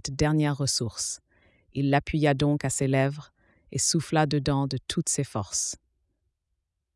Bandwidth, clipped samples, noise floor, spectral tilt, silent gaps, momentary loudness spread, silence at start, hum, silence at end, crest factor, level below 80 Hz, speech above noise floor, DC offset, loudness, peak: 12 kHz; under 0.1%; -80 dBFS; -4.5 dB/octave; none; 8 LU; 0.05 s; none; 1.2 s; 18 dB; -50 dBFS; 54 dB; under 0.1%; -26 LUFS; -8 dBFS